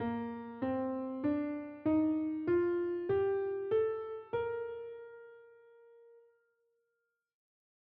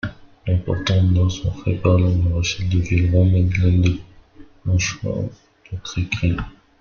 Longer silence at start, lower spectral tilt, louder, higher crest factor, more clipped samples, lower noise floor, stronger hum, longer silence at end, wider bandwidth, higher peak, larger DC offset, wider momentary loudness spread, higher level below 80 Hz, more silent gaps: about the same, 0 s vs 0.05 s; about the same, -7 dB/octave vs -6 dB/octave; second, -35 LUFS vs -20 LUFS; about the same, 14 dB vs 16 dB; neither; first, -85 dBFS vs -45 dBFS; neither; first, 1.8 s vs 0.3 s; second, 4.6 kHz vs 7 kHz; second, -22 dBFS vs -4 dBFS; neither; about the same, 13 LU vs 14 LU; second, -72 dBFS vs -36 dBFS; neither